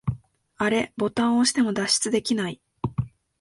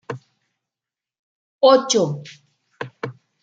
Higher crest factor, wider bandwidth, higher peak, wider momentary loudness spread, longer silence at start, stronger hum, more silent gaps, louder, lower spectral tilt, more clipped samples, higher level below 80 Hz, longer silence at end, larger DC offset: about the same, 16 dB vs 20 dB; first, 11.5 kHz vs 9 kHz; second, -8 dBFS vs -2 dBFS; second, 12 LU vs 21 LU; about the same, 0.05 s vs 0.1 s; neither; second, none vs 1.19-1.59 s; second, -24 LUFS vs -17 LUFS; about the same, -4 dB/octave vs -4 dB/octave; neither; first, -50 dBFS vs -72 dBFS; about the same, 0.35 s vs 0.3 s; neither